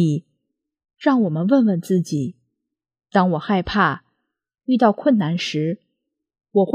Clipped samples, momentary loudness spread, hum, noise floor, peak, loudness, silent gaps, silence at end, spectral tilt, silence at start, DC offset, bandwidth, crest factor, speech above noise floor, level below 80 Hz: under 0.1%; 10 LU; none; -81 dBFS; -4 dBFS; -20 LUFS; none; 0 s; -7 dB/octave; 0 s; under 0.1%; 14 kHz; 18 dB; 62 dB; -52 dBFS